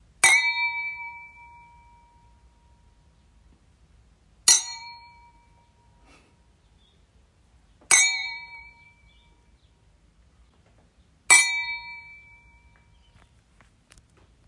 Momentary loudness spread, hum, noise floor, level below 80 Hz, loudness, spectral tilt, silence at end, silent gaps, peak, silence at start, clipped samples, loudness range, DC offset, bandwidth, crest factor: 27 LU; none; -60 dBFS; -60 dBFS; -19 LUFS; 2.5 dB/octave; 2.45 s; none; -2 dBFS; 0.25 s; under 0.1%; 7 LU; under 0.1%; 12 kHz; 28 dB